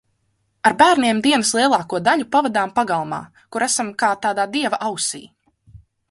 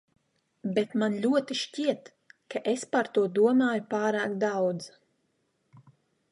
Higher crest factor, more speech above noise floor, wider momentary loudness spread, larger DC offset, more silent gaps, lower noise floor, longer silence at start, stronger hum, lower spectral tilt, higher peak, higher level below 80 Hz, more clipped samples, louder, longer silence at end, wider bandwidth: about the same, 20 dB vs 18 dB; about the same, 49 dB vs 47 dB; second, 9 LU vs 13 LU; neither; neither; second, -68 dBFS vs -74 dBFS; about the same, 0.65 s vs 0.65 s; neither; second, -2.5 dB/octave vs -5 dB/octave; first, 0 dBFS vs -12 dBFS; first, -60 dBFS vs -80 dBFS; neither; first, -18 LUFS vs -28 LUFS; second, 0.35 s vs 0.5 s; about the same, 11.5 kHz vs 11.5 kHz